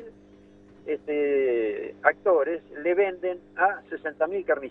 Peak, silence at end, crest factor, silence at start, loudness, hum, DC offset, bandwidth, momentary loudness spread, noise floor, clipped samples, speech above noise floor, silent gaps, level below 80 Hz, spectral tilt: -4 dBFS; 0 s; 22 dB; 0 s; -26 LUFS; 50 Hz at -60 dBFS; under 0.1%; 3.9 kHz; 10 LU; -52 dBFS; under 0.1%; 27 dB; none; -66 dBFS; -7.5 dB/octave